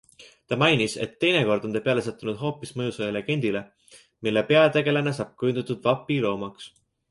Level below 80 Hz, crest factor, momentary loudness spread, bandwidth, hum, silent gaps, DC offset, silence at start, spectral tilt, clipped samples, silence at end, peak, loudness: -62 dBFS; 20 dB; 11 LU; 11.5 kHz; none; none; under 0.1%; 0.2 s; -5.5 dB/octave; under 0.1%; 0.45 s; -4 dBFS; -24 LUFS